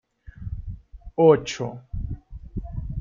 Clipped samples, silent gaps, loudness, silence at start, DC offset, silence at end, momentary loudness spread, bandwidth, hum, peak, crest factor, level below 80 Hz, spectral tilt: under 0.1%; none; -23 LUFS; 0.25 s; under 0.1%; 0 s; 22 LU; 7.6 kHz; none; -4 dBFS; 22 dB; -38 dBFS; -6.5 dB/octave